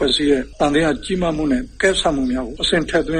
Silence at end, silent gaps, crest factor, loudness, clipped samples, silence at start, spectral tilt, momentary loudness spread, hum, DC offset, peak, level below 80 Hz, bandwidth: 0 s; none; 14 dB; -18 LUFS; under 0.1%; 0 s; -4.5 dB/octave; 5 LU; none; under 0.1%; -4 dBFS; -34 dBFS; 10 kHz